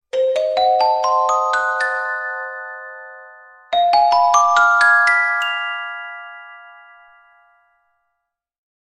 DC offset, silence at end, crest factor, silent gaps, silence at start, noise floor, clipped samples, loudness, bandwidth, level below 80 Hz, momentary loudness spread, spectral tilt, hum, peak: under 0.1%; 2.1 s; 16 dB; none; 0.15 s; -77 dBFS; under 0.1%; -16 LUFS; 11 kHz; -58 dBFS; 21 LU; 1 dB/octave; none; -2 dBFS